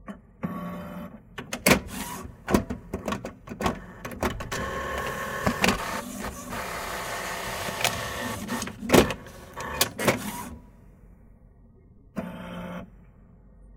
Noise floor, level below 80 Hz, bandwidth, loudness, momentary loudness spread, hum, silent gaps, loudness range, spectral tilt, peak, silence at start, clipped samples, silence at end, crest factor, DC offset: -53 dBFS; -46 dBFS; 18 kHz; -28 LUFS; 18 LU; none; none; 5 LU; -4 dB/octave; -2 dBFS; 0 s; under 0.1%; 0 s; 28 dB; under 0.1%